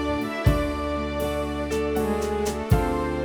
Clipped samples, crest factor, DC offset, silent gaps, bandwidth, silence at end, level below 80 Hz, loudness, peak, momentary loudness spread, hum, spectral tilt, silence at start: under 0.1%; 18 dB; under 0.1%; none; over 20 kHz; 0 s; -32 dBFS; -25 LUFS; -6 dBFS; 4 LU; none; -6.5 dB/octave; 0 s